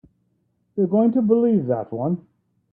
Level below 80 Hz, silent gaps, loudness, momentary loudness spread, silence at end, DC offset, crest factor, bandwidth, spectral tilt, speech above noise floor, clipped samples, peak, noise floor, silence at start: -66 dBFS; none; -21 LUFS; 10 LU; 0.5 s; under 0.1%; 16 dB; 3.2 kHz; -13.5 dB/octave; 49 dB; under 0.1%; -6 dBFS; -68 dBFS; 0.75 s